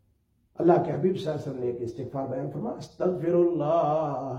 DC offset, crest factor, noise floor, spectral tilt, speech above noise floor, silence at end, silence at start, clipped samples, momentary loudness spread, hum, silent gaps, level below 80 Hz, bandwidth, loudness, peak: under 0.1%; 20 dB; -68 dBFS; -9 dB/octave; 42 dB; 0 s; 0.6 s; under 0.1%; 11 LU; none; none; -64 dBFS; 7.8 kHz; -27 LUFS; -6 dBFS